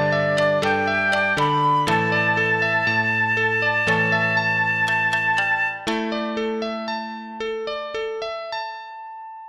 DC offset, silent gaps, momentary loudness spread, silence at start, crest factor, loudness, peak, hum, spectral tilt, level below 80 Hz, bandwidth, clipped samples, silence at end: under 0.1%; none; 11 LU; 0 s; 14 dB; -20 LUFS; -8 dBFS; none; -5 dB/octave; -58 dBFS; 13 kHz; under 0.1%; 0 s